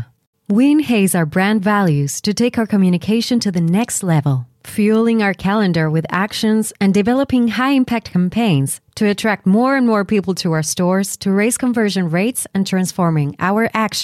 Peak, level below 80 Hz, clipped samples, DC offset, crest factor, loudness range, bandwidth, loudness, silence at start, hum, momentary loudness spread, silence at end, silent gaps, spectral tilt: -4 dBFS; -52 dBFS; under 0.1%; under 0.1%; 12 dB; 1 LU; 15 kHz; -16 LUFS; 0 s; none; 4 LU; 0 s; 0.27-0.33 s; -5.5 dB/octave